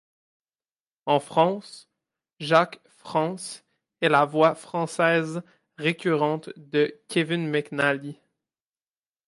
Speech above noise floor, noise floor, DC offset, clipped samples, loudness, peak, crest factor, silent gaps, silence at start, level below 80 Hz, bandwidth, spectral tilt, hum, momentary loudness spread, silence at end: over 66 dB; under -90 dBFS; under 0.1%; under 0.1%; -24 LUFS; -6 dBFS; 20 dB; none; 1.05 s; -76 dBFS; 11.5 kHz; -5.5 dB/octave; none; 15 LU; 1.15 s